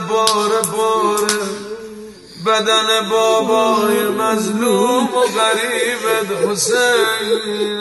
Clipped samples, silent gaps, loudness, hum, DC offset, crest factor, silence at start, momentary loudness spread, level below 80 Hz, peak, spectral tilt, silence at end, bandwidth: under 0.1%; none; -15 LUFS; none; under 0.1%; 16 dB; 0 s; 9 LU; -60 dBFS; 0 dBFS; -2.5 dB/octave; 0 s; 12.5 kHz